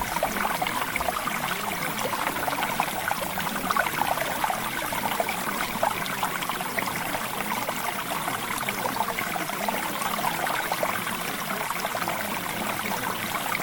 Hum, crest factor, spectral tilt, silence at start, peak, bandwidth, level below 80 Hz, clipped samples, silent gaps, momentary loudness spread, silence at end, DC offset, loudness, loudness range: none; 20 dB; -2.5 dB/octave; 0 s; -8 dBFS; 18 kHz; -54 dBFS; under 0.1%; none; 2 LU; 0 s; under 0.1%; -27 LUFS; 1 LU